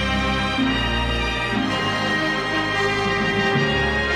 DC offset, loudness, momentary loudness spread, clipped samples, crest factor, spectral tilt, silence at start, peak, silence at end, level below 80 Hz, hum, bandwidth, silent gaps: under 0.1%; -20 LUFS; 2 LU; under 0.1%; 14 dB; -5 dB/octave; 0 s; -8 dBFS; 0 s; -32 dBFS; none; 14.5 kHz; none